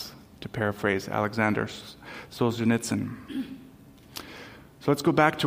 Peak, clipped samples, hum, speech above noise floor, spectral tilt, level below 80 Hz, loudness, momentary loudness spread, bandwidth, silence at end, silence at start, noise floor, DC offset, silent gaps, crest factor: -6 dBFS; under 0.1%; none; 24 dB; -5.5 dB/octave; -60 dBFS; -27 LUFS; 18 LU; 16 kHz; 0 s; 0 s; -51 dBFS; under 0.1%; none; 22 dB